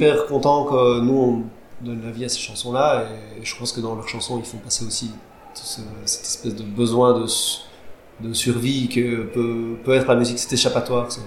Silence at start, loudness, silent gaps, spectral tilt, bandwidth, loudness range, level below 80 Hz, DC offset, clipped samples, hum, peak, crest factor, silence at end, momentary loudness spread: 0 s; -21 LUFS; none; -4 dB/octave; 16 kHz; 6 LU; -50 dBFS; 0.4%; under 0.1%; none; -4 dBFS; 18 dB; 0 s; 14 LU